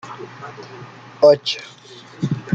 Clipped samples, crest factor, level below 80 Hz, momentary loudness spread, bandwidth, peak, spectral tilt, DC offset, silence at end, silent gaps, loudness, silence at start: under 0.1%; 18 dB; -60 dBFS; 25 LU; 7.8 kHz; -2 dBFS; -5.5 dB/octave; under 0.1%; 0 s; none; -18 LUFS; 0.05 s